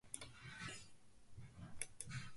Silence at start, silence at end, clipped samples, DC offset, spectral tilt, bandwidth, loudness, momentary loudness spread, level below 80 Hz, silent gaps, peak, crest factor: 0.05 s; 0 s; under 0.1%; under 0.1%; -2.5 dB/octave; 11.5 kHz; -53 LUFS; 13 LU; -68 dBFS; none; -26 dBFS; 26 dB